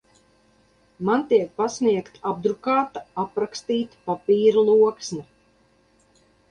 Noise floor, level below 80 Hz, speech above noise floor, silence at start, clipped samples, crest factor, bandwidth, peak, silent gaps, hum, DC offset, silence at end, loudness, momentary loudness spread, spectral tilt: -61 dBFS; -66 dBFS; 39 dB; 1 s; under 0.1%; 16 dB; 9.6 kHz; -6 dBFS; none; none; under 0.1%; 1.25 s; -22 LUFS; 12 LU; -5.5 dB/octave